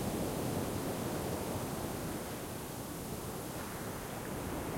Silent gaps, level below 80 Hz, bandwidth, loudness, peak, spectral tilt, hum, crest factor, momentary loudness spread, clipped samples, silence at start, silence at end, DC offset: none; -54 dBFS; 16.5 kHz; -39 LUFS; -24 dBFS; -5 dB/octave; none; 16 dB; 5 LU; under 0.1%; 0 s; 0 s; under 0.1%